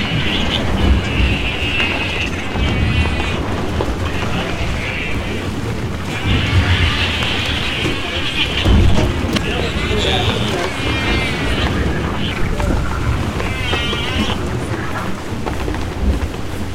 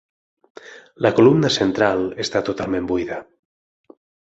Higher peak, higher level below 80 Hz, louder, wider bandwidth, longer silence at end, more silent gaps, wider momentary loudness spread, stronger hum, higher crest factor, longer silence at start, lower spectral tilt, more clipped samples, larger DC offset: about the same, -4 dBFS vs -2 dBFS; first, -24 dBFS vs -52 dBFS; about the same, -18 LUFS vs -19 LUFS; first, 15.5 kHz vs 8 kHz; second, 0 s vs 1 s; neither; second, 7 LU vs 10 LU; neither; second, 12 dB vs 18 dB; second, 0 s vs 0.65 s; about the same, -5 dB/octave vs -5.5 dB/octave; neither; first, 3% vs under 0.1%